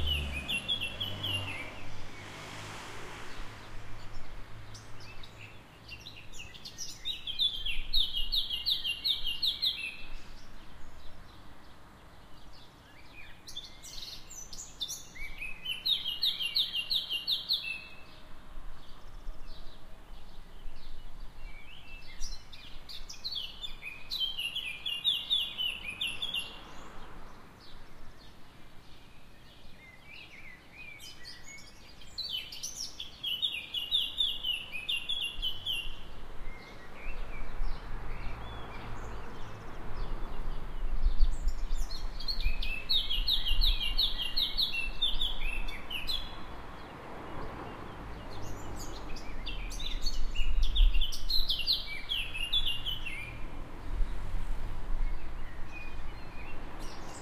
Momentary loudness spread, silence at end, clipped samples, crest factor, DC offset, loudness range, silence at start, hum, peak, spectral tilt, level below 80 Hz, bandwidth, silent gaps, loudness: 23 LU; 0 s; under 0.1%; 22 dB; under 0.1%; 18 LU; 0 s; none; -10 dBFS; -2 dB/octave; -38 dBFS; 14 kHz; none; -34 LUFS